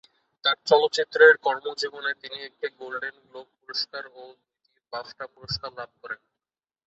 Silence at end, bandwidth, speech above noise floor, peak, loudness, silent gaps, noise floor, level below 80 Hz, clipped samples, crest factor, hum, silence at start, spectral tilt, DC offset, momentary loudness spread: 0.7 s; 8 kHz; over 65 dB; -4 dBFS; -24 LUFS; none; under -90 dBFS; -64 dBFS; under 0.1%; 24 dB; none; 0.45 s; -2.5 dB/octave; under 0.1%; 22 LU